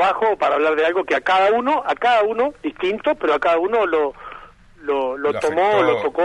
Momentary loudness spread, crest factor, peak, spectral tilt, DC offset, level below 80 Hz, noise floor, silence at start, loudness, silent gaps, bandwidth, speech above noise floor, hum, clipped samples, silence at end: 7 LU; 14 dB; -6 dBFS; -4.5 dB/octave; under 0.1%; -54 dBFS; -42 dBFS; 0 s; -19 LUFS; none; 11.5 kHz; 24 dB; none; under 0.1%; 0 s